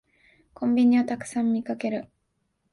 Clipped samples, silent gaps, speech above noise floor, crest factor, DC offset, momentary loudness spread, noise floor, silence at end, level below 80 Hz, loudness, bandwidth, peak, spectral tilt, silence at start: under 0.1%; none; 51 dB; 14 dB; under 0.1%; 11 LU; -74 dBFS; 0.7 s; -66 dBFS; -25 LUFS; 11.5 kHz; -12 dBFS; -6 dB/octave; 0.6 s